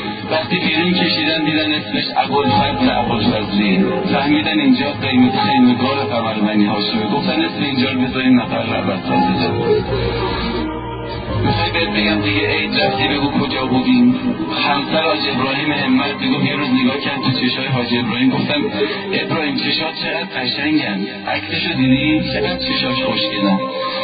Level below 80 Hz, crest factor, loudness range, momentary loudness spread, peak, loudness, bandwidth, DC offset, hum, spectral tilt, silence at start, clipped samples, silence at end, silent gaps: -38 dBFS; 14 dB; 3 LU; 5 LU; -2 dBFS; -16 LUFS; 5 kHz; under 0.1%; none; -11 dB/octave; 0 s; under 0.1%; 0 s; none